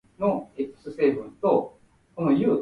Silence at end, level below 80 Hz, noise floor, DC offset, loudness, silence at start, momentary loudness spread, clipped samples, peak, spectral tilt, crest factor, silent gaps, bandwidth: 0 s; -62 dBFS; -55 dBFS; under 0.1%; -26 LUFS; 0.2 s; 11 LU; under 0.1%; -8 dBFS; -9.5 dB/octave; 16 dB; none; 5 kHz